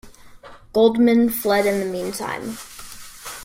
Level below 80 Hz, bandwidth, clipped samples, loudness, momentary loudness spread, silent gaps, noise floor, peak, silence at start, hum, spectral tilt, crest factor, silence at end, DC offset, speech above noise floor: -52 dBFS; 16.5 kHz; under 0.1%; -19 LUFS; 20 LU; none; -43 dBFS; -4 dBFS; 0.05 s; none; -4.5 dB/octave; 16 dB; 0 s; under 0.1%; 24 dB